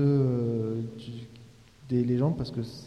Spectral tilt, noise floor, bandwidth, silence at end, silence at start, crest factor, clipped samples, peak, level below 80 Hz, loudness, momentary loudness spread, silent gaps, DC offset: -9.5 dB/octave; -52 dBFS; 9 kHz; 0 s; 0 s; 14 dB; under 0.1%; -14 dBFS; -56 dBFS; -29 LUFS; 17 LU; none; under 0.1%